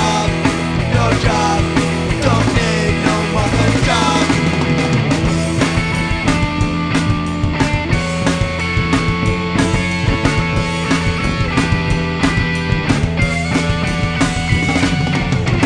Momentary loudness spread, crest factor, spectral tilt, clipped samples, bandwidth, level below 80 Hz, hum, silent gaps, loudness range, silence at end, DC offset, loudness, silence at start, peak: 3 LU; 14 dB; -5.5 dB/octave; under 0.1%; 10 kHz; -26 dBFS; none; none; 2 LU; 0 s; under 0.1%; -16 LUFS; 0 s; 0 dBFS